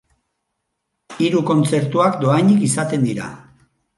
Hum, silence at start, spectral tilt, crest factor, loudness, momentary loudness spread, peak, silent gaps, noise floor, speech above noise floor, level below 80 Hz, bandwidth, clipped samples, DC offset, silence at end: none; 1.1 s; -6 dB/octave; 16 dB; -17 LUFS; 8 LU; -2 dBFS; none; -75 dBFS; 59 dB; -60 dBFS; 11.5 kHz; under 0.1%; under 0.1%; 0.6 s